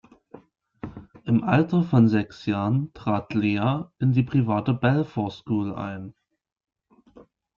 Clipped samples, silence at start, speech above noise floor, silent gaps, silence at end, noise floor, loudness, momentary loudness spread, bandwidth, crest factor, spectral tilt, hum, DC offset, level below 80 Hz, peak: under 0.1%; 0.35 s; 30 dB; none; 0.35 s; -53 dBFS; -24 LUFS; 18 LU; 7 kHz; 18 dB; -9 dB/octave; none; under 0.1%; -58 dBFS; -6 dBFS